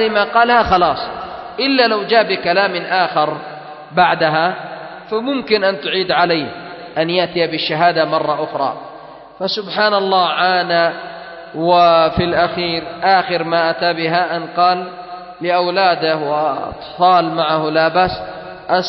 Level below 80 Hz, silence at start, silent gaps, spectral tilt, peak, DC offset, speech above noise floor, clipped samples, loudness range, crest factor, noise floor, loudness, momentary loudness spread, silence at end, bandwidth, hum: -46 dBFS; 0 s; none; -6.5 dB/octave; 0 dBFS; under 0.1%; 21 dB; under 0.1%; 3 LU; 16 dB; -36 dBFS; -15 LUFS; 15 LU; 0 s; 6 kHz; none